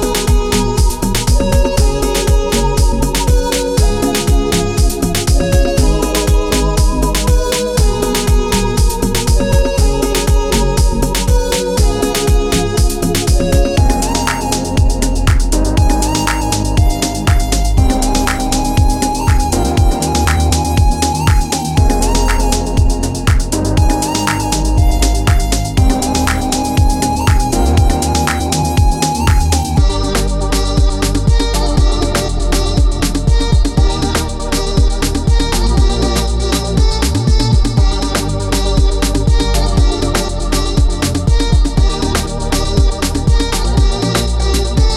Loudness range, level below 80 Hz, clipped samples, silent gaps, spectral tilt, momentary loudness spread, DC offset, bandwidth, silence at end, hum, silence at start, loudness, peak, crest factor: 1 LU; -14 dBFS; under 0.1%; none; -5 dB/octave; 2 LU; under 0.1%; 16 kHz; 0 s; none; 0 s; -14 LUFS; 0 dBFS; 12 dB